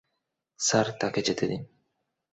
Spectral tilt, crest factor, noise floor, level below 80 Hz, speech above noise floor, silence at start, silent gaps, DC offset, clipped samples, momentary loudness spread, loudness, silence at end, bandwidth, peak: -3.5 dB/octave; 22 dB; -81 dBFS; -64 dBFS; 54 dB; 0.6 s; none; under 0.1%; under 0.1%; 7 LU; -27 LUFS; 0.65 s; 8.2 kHz; -8 dBFS